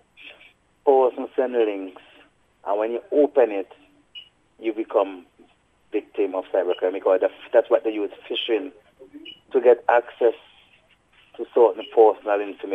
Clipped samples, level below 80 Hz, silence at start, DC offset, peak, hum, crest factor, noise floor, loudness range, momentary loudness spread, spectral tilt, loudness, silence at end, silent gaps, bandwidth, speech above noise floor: under 0.1%; -72 dBFS; 0.25 s; under 0.1%; -2 dBFS; 60 Hz at -75 dBFS; 22 dB; -59 dBFS; 5 LU; 22 LU; -5 dB/octave; -22 LUFS; 0 s; none; 3.8 kHz; 38 dB